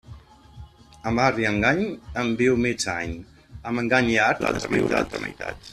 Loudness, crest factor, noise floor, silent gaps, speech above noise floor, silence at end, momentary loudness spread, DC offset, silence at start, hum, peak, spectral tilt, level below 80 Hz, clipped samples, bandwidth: -23 LUFS; 20 dB; -45 dBFS; none; 22 dB; 0 s; 13 LU; under 0.1%; 0.1 s; none; -4 dBFS; -5 dB/octave; -46 dBFS; under 0.1%; 13.5 kHz